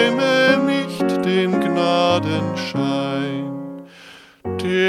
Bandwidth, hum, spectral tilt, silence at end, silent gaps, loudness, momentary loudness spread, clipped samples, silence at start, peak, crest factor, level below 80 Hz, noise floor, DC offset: 14.5 kHz; none; -5.5 dB/octave; 0 s; none; -19 LUFS; 13 LU; under 0.1%; 0 s; -2 dBFS; 18 dB; -58 dBFS; -44 dBFS; under 0.1%